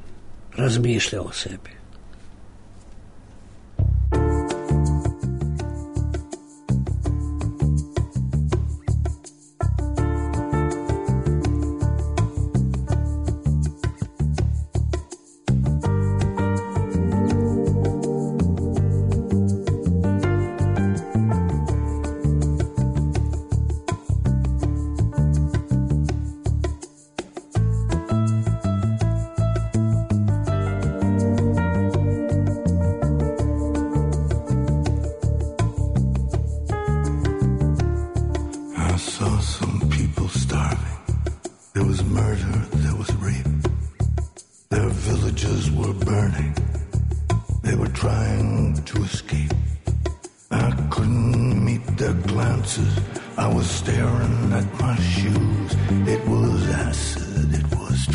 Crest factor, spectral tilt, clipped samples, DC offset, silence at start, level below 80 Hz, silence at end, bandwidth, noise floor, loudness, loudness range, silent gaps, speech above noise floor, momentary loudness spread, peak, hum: 10 dB; -6.5 dB/octave; under 0.1%; under 0.1%; 0 s; -28 dBFS; 0 s; 11 kHz; -43 dBFS; -23 LUFS; 3 LU; none; 20 dB; 6 LU; -10 dBFS; none